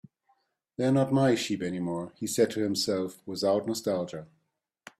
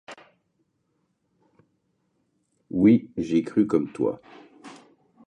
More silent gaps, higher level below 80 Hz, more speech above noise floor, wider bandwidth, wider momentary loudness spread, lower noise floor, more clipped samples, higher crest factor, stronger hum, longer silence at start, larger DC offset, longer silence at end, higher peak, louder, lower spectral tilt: neither; second, -70 dBFS vs -62 dBFS; about the same, 50 dB vs 51 dB; first, 15.5 kHz vs 9.4 kHz; second, 10 LU vs 15 LU; first, -78 dBFS vs -73 dBFS; neither; about the same, 18 dB vs 20 dB; neither; first, 0.8 s vs 0.1 s; neither; first, 0.75 s vs 0.55 s; second, -12 dBFS vs -8 dBFS; second, -28 LUFS vs -23 LUFS; second, -5 dB/octave vs -8.5 dB/octave